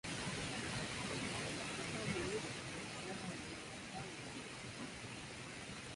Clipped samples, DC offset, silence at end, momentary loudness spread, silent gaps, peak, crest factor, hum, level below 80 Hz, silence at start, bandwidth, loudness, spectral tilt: under 0.1%; under 0.1%; 0 s; 7 LU; none; -28 dBFS; 16 dB; none; -64 dBFS; 0.05 s; 11.5 kHz; -44 LUFS; -3.5 dB/octave